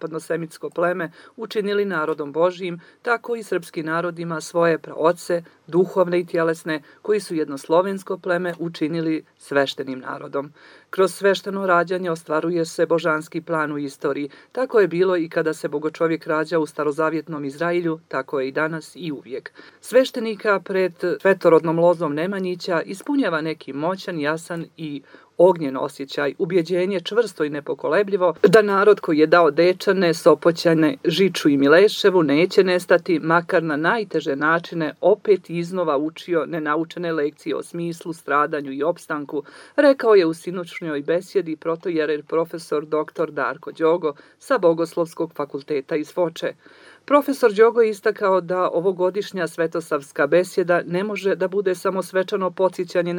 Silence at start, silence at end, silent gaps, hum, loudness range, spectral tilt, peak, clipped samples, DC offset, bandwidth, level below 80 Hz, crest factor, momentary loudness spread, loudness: 0 s; 0 s; none; none; 7 LU; -5.5 dB/octave; 0 dBFS; under 0.1%; under 0.1%; 19.5 kHz; -78 dBFS; 20 dB; 12 LU; -21 LUFS